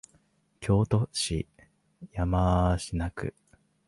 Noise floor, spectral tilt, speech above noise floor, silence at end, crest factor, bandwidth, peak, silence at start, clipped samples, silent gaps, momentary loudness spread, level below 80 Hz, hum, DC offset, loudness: -67 dBFS; -6 dB/octave; 40 dB; 0.55 s; 18 dB; 11.5 kHz; -12 dBFS; 0.6 s; under 0.1%; none; 14 LU; -40 dBFS; none; under 0.1%; -28 LUFS